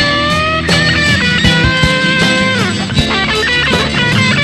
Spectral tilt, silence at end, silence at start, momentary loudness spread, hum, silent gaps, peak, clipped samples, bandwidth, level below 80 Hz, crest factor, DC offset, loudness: -4 dB/octave; 0 s; 0 s; 3 LU; none; none; 0 dBFS; under 0.1%; 13.5 kHz; -28 dBFS; 12 dB; 0.2%; -10 LUFS